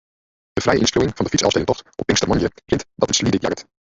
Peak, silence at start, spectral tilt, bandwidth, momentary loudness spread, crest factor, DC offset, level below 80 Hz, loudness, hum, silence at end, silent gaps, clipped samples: -2 dBFS; 0.55 s; -4 dB/octave; 8 kHz; 7 LU; 18 dB; under 0.1%; -40 dBFS; -19 LUFS; none; 0.2 s; none; under 0.1%